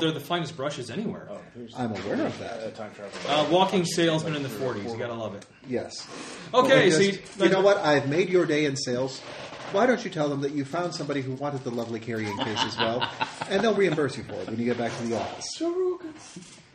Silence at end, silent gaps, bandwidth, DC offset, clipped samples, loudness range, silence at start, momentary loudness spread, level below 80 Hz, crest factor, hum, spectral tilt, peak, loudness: 0.15 s; none; 11.5 kHz; under 0.1%; under 0.1%; 6 LU; 0 s; 16 LU; -66 dBFS; 20 dB; none; -5 dB/octave; -6 dBFS; -26 LUFS